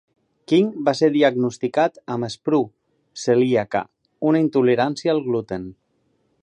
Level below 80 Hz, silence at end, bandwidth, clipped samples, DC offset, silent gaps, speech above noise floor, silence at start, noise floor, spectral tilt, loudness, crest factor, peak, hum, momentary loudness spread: -62 dBFS; 0.7 s; 10 kHz; under 0.1%; under 0.1%; none; 47 dB; 0.5 s; -67 dBFS; -6 dB/octave; -20 LUFS; 18 dB; -4 dBFS; none; 12 LU